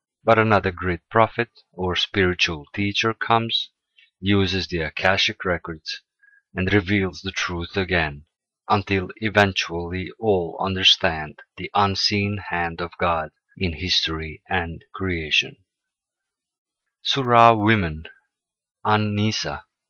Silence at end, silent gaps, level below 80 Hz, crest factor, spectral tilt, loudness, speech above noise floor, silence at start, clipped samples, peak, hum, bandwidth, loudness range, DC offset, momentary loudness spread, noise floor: 0.3 s; 16.58-16.65 s; -46 dBFS; 22 dB; -4.5 dB/octave; -21 LUFS; 65 dB; 0.25 s; under 0.1%; -2 dBFS; none; 7.6 kHz; 4 LU; under 0.1%; 12 LU; -87 dBFS